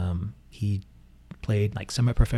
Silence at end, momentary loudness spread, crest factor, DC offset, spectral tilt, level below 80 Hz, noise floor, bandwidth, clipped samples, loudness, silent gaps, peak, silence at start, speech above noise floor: 0 s; 12 LU; 20 dB; under 0.1%; -6.5 dB/octave; -34 dBFS; -48 dBFS; 12.5 kHz; under 0.1%; -29 LUFS; none; -6 dBFS; 0 s; 24 dB